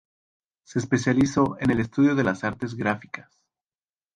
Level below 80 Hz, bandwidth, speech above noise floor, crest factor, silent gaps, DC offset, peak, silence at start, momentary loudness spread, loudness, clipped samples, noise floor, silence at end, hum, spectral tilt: -54 dBFS; 9.6 kHz; over 67 dB; 18 dB; none; under 0.1%; -8 dBFS; 0.7 s; 11 LU; -24 LUFS; under 0.1%; under -90 dBFS; 0.95 s; none; -6.5 dB/octave